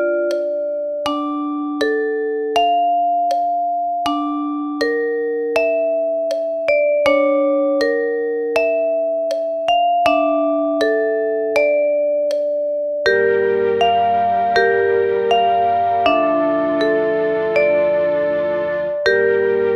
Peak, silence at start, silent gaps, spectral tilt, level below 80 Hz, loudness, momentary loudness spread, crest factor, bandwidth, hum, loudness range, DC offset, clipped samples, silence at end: -2 dBFS; 0 s; none; -5 dB/octave; -56 dBFS; -17 LUFS; 6 LU; 16 dB; 12 kHz; none; 3 LU; under 0.1%; under 0.1%; 0 s